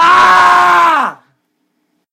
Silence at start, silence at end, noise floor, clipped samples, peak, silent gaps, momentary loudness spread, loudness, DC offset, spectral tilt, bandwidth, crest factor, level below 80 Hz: 0 s; 1 s; -64 dBFS; 0.5%; 0 dBFS; none; 9 LU; -7 LUFS; under 0.1%; -2 dB/octave; 16 kHz; 10 dB; -54 dBFS